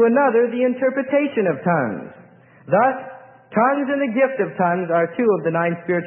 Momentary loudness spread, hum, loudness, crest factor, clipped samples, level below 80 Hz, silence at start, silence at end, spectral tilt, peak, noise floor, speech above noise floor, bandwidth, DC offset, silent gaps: 7 LU; none; -19 LUFS; 14 dB; under 0.1%; -72 dBFS; 0 s; 0 s; -12 dB/octave; -4 dBFS; -47 dBFS; 29 dB; 3.4 kHz; under 0.1%; none